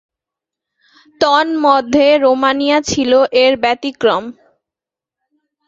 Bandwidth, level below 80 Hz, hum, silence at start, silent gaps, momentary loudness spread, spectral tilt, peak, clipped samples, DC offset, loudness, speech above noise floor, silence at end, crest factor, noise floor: 7.8 kHz; -52 dBFS; none; 1.2 s; none; 6 LU; -3.5 dB/octave; 0 dBFS; under 0.1%; under 0.1%; -13 LUFS; 74 dB; 1.35 s; 14 dB; -87 dBFS